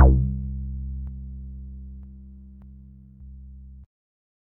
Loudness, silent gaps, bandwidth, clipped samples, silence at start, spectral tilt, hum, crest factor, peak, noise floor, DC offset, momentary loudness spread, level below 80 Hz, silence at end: -29 LUFS; none; 1.7 kHz; under 0.1%; 0 s; -9.5 dB/octave; none; 24 dB; -2 dBFS; -46 dBFS; under 0.1%; 20 LU; -28 dBFS; 0.75 s